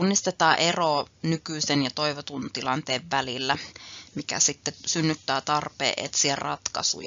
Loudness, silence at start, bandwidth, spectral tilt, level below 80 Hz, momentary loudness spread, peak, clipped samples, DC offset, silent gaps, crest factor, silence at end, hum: -25 LUFS; 0 s; 7.6 kHz; -2.5 dB/octave; -64 dBFS; 9 LU; -6 dBFS; under 0.1%; under 0.1%; none; 22 dB; 0 s; none